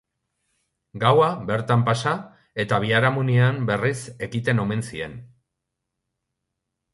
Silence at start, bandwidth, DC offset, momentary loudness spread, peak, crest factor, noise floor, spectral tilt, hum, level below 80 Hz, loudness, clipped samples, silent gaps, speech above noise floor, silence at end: 0.95 s; 11.5 kHz; under 0.1%; 12 LU; -4 dBFS; 20 dB; -81 dBFS; -6.5 dB/octave; none; -56 dBFS; -22 LUFS; under 0.1%; none; 60 dB; 1.65 s